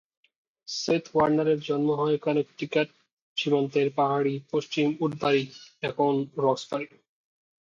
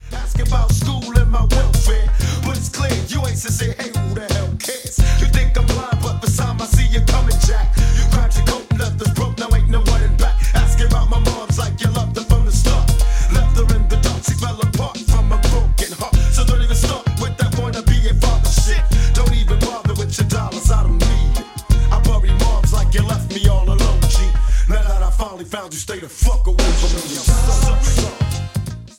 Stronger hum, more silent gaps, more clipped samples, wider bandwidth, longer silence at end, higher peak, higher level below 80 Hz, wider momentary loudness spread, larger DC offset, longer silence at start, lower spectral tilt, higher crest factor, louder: neither; first, 3.13-3.36 s vs none; neither; second, 7.6 kHz vs 16 kHz; first, 0.75 s vs 0.1 s; second, -10 dBFS vs 0 dBFS; second, -68 dBFS vs -16 dBFS; first, 10 LU vs 5 LU; neither; first, 0.7 s vs 0.05 s; about the same, -5.5 dB/octave vs -5 dB/octave; about the same, 18 dB vs 14 dB; second, -27 LUFS vs -18 LUFS